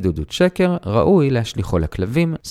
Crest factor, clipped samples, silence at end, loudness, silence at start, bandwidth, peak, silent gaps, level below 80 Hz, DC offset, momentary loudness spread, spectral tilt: 16 dB; under 0.1%; 0 s; -18 LUFS; 0 s; 14.5 kHz; -2 dBFS; none; -34 dBFS; under 0.1%; 7 LU; -7 dB/octave